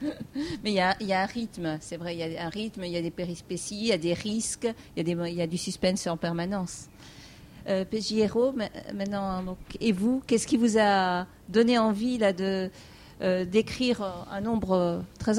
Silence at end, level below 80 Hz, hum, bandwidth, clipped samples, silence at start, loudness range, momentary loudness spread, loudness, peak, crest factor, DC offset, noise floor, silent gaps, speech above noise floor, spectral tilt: 0 s; -54 dBFS; none; 15.5 kHz; under 0.1%; 0 s; 6 LU; 11 LU; -28 LUFS; -10 dBFS; 18 dB; under 0.1%; -47 dBFS; none; 19 dB; -5 dB/octave